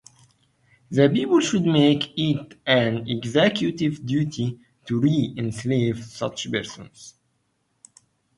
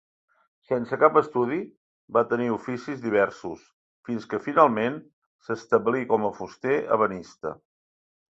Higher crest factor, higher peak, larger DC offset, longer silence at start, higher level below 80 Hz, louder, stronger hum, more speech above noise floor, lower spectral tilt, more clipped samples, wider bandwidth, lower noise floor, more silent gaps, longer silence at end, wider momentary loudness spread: about the same, 20 dB vs 24 dB; about the same, -4 dBFS vs -2 dBFS; neither; first, 0.9 s vs 0.7 s; first, -58 dBFS vs -66 dBFS; first, -22 LUFS vs -25 LUFS; neither; second, 49 dB vs over 65 dB; about the same, -6 dB/octave vs -7 dB/octave; neither; first, 11.5 kHz vs 7.8 kHz; second, -71 dBFS vs under -90 dBFS; second, none vs 1.77-2.08 s, 3.73-4.03 s, 5.13-5.39 s; first, 1.25 s vs 0.85 s; second, 11 LU vs 17 LU